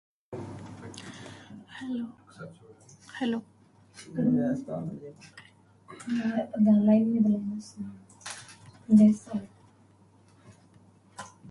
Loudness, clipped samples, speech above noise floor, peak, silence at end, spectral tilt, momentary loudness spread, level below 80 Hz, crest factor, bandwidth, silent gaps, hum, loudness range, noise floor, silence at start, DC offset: -27 LUFS; under 0.1%; 33 dB; -10 dBFS; 0 s; -7 dB/octave; 25 LU; -68 dBFS; 20 dB; 11.5 kHz; none; none; 13 LU; -59 dBFS; 0.3 s; under 0.1%